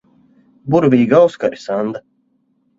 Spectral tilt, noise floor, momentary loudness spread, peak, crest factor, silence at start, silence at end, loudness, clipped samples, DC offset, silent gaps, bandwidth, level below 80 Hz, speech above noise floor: -8 dB/octave; -62 dBFS; 16 LU; 0 dBFS; 16 dB; 0.65 s; 0.8 s; -15 LUFS; under 0.1%; under 0.1%; none; 7.6 kHz; -58 dBFS; 48 dB